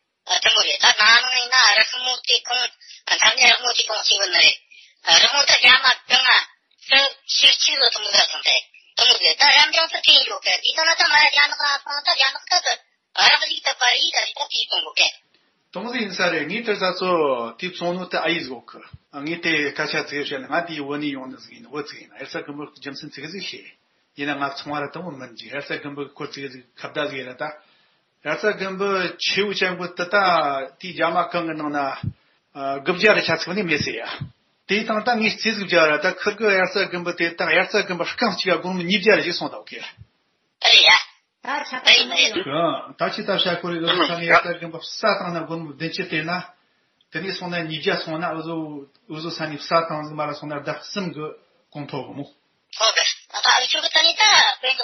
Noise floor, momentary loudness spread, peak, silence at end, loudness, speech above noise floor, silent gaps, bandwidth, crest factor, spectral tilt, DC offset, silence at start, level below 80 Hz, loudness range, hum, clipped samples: -69 dBFS; 19 LU; -2 dBFS; 0 s; -18 LUFS; 48 dB; none; 7.2 kHz; 20 dB; 0.5 dB/octave; under 0.1%; 0.25 s; -66 dBFS; 15 LU; none; under 0.1%